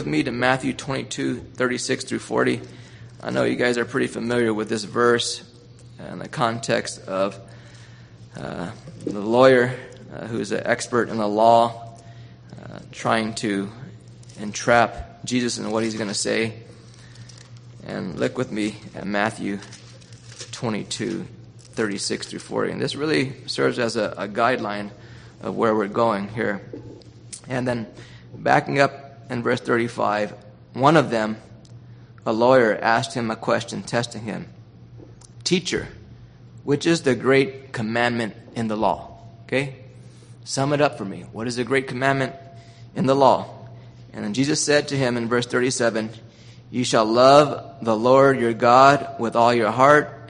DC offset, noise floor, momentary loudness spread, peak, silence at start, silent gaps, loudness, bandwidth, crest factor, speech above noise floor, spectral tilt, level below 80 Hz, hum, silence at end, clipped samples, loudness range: under 0.1%; -45 dBFS; 20 LU; 0 dBFS; 0 s; none; -21 LUFS; 10 kHz; 22 dB; 24 dB; -4.5 dB/octave; -54 dBFS; none; 0 s; under 0.1%; 8 LU